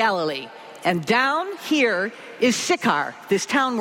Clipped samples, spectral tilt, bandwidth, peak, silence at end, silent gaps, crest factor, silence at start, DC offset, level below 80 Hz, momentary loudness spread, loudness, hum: under 0.1%; -3.5 dB/octave; 16.5 kHz; -6 dBFS; 0 s; none; 16 dB; 0 s; under 0.1%; -68 dBFS; 8 LU; -22 LUFS; none